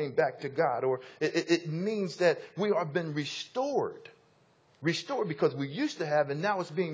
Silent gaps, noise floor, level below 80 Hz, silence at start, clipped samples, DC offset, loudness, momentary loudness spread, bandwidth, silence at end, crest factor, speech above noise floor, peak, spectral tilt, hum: none; -65 dBFS; -80 dBFS; 0 s; under 0.1%; under 0.1%; -31 LUFS; 5 LU; 8 kHz; 0 s; 20 dB; 35 dB; -12 dBFS; -5.5 dB/octave; none